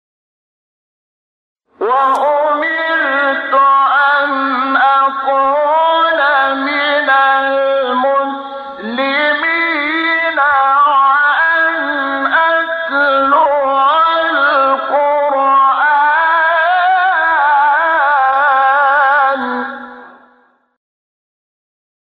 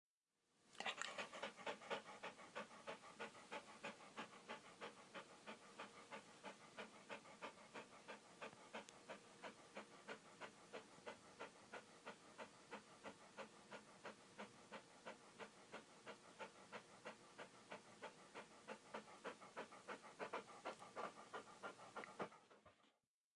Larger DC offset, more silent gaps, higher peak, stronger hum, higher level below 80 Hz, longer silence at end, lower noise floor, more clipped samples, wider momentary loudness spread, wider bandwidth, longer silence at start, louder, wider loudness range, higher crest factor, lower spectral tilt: neither; neither; first, -2 dBFS vs -28 dBFS; neither; first, -60 dBFS vs under -90 dBFS; first, 2.1 s vs 0.45 s; second, -52 dBFS vs -90 dBFS; neither; second, 5 LU vs 9 LU; second, 6 kHz vs 11 kHz; first, 1.8 s vs 0.55 s; first, -12 LUFS vs -57 LUFS; second, 3 LU vs 6 LU; second, 12 dB vs 30 dB; first, -4 dB/octave vs -2.5 dB/octave